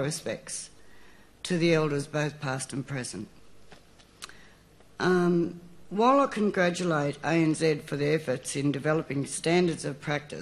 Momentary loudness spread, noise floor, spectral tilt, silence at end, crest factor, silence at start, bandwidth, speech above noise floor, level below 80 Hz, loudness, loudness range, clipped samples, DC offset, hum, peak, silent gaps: 15 LU; -56 dBFS; -5.5 dB/octave; 0 s; 18 dB; 0 s; 13.5 kHz; 29 dB; -62 dBFS; -28 LUFS; 6 LU; under 0.1%; under 0.1%; none; -10 dBFS; none